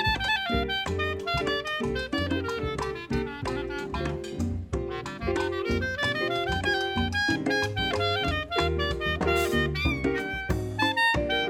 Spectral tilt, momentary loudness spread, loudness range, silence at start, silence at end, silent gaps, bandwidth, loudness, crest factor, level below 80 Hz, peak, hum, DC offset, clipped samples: -5 dB/octave; 7 LU; 5 LU; 0 s; 0 s; none; 17.5 kHz; -27 LUFS; 16 dB; -40 dBFS; -12 dBFS; none; under 0.1%; under 0.1%